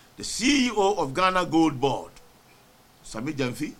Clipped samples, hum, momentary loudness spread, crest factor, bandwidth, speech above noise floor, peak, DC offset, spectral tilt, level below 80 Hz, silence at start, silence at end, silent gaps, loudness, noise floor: under 0.1%; none; 12 LU; 18 dB; 16 kHz; 31 dB; -6 dBFS; under 0.1%; -4 dB/octave; -50 dBFS; 0.2 s; 0.05 s; none; -24 LUFS; -56 dBFS